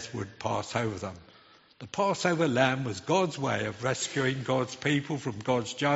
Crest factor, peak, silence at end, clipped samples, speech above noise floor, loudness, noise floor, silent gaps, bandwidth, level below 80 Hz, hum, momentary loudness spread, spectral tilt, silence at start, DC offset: 20 dB; -8 dBFS; 0 s; under 0.1%; 29 dB; -29 LUFS; -58 dBFS; none; 8 kHz; -64 dBFS; none; 11 LU; -4 dB/octave; 0 s; under 0.1%